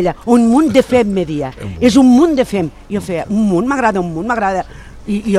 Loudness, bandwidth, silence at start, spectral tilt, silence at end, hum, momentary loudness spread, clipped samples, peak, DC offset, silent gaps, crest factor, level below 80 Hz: -13 LUFS; 12.5 kHz; 0 s; -6 dB/octave; 0 s; none; 12 LU; under 0.1%; 0 dBFS; under 0.1%; none; 12 dB; -38 dBFS